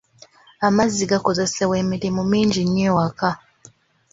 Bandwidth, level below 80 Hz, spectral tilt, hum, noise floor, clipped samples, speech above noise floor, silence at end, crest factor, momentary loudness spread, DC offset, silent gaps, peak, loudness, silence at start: 7.8 kHz; -50 dBFS; -5 dB/octave; none; -51 dBFS; under 0.1%; 32 dB; 0.75 s; 18 dB; 5 LU; under 0.1%; none; -2 dBFS; -20 LUFS; 0.6 s